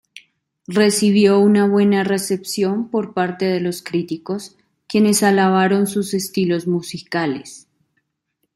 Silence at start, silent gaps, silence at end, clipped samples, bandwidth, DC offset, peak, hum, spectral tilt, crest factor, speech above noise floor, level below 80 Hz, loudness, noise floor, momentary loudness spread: 0.7 s; none; 1 s; under 0.1%; 15.5 kHz; under 0.1%; -2 dBFS; none; -5 dB/octave; 16 dB; 56 dB; -64 dBFS; -18 LUFS; -73 dBFS; 11 LU